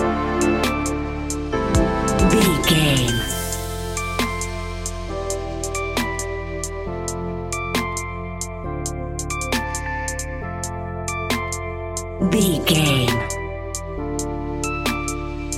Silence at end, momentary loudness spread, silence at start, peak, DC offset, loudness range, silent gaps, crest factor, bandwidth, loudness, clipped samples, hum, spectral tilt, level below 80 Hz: 0 s; 12 LU; 0 s; -4 dBFS; under 0.1%; 7 LU; none; 18 dB; 16.5 kHz; -22 LUFS; under 0.1%; none; -4.5 dB/octave; -32 dBFS